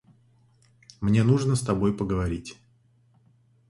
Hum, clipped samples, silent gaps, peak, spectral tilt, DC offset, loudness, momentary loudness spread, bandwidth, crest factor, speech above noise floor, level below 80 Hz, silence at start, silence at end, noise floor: none; under 0.1%; none; -8 dBFS; -7 dB/octave; under 0.1%; -25 LUFS; 11 LU; 11.5 kHz; 20 dB; 39 dB; -46 dBFS; 1 s; 1.15 s; -62 dBFS